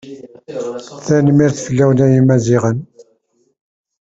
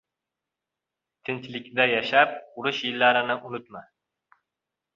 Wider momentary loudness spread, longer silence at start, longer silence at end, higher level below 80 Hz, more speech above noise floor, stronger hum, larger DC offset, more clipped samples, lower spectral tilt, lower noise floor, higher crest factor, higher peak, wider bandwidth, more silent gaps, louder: about the same, 17 LU vs 17 LU; second, 0.05 s vs 1.3 s; about the same, 1.15 s vs 1.15 s; first, -48 dBFS vs -74 dBFS; second, 48 dB vs 62 dB; neither; neither; neither; first, -7.5 dB/octave vs -4.5 dB/octave; second, -60 dBFS vs -87 dBFS; second, 14 dB vs 24 dB; about the same, -2 dBFS vs -4 dBFS; about the same, 7.8 kHz vs 7.4 kHz; neither; first, -13 LUFS vs -24 LUFS